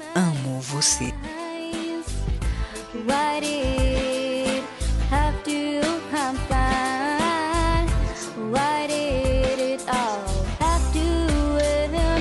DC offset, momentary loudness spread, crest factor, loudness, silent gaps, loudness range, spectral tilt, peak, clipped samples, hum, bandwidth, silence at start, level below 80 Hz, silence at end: under 0.1%; 8 LU; 16 dB; -24 LUFS; none; 2 LU; -4.5 dB/octave; -6 dBFS; under 0.1%; none; 12 kHz; 0 s; -28 dBFS; 0 s